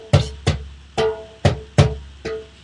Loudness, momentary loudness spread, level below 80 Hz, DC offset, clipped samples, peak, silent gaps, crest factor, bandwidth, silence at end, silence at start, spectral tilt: -22 LUFS; 12 LU; -34 dBFS; under 0.1%; under 0.1%; 0 dBFS; none; 20 dB; 11 kHz; 0.15 s; 0 s; -6 dB/octave